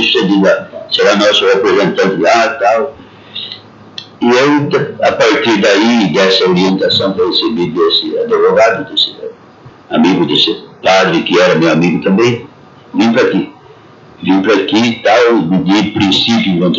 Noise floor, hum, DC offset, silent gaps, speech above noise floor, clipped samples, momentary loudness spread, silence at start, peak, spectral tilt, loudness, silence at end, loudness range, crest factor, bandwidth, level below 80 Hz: -38 dBFS; none; under 0.1%; none; 28 dB; under 0.1%; 11 LU; 0 s; 0 dBFS; -5 dB/octave; -10 LUFS; 0 s; 3 LU; 10 dB; 7.8 kHz; -54 dBFS